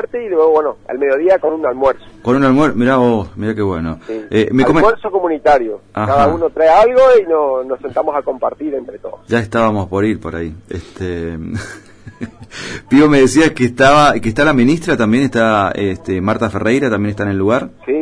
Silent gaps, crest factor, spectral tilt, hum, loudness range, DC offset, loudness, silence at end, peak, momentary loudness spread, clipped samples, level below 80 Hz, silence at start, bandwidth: none; 14 dB; -6 dB/octave; none; 7 LU; under 0.1%; -14 LUFS; 0 s; 0 dBFS; 15 LU; under 0.1%; -38 dBFS; 0 s; 10.5 kHz